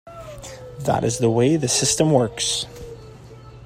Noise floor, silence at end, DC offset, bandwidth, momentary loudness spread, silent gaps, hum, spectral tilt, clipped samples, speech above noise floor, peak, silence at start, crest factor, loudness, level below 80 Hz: -41 dBFS; 0 s; under 0.1%; 16 kHz; 21 LU; none; none; -4 dB/octave; under 0.1%; 22 dB; -2 dBFS; 0.05 s; 20 dB; -19 LUFS; -48 dBFS